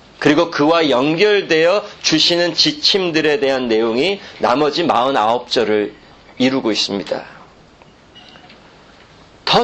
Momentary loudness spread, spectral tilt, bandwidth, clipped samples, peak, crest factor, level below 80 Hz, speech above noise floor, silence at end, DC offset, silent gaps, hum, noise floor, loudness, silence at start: 6 LU; -3.5 dB/octave; 8.6 kHz; under 0.1%; 0 dBFS; 16 dB; -54 dBFS; 30 dB; 0 s; under 0.1%; none; none; -46 dBFS; -15 LUFS; 0.2 s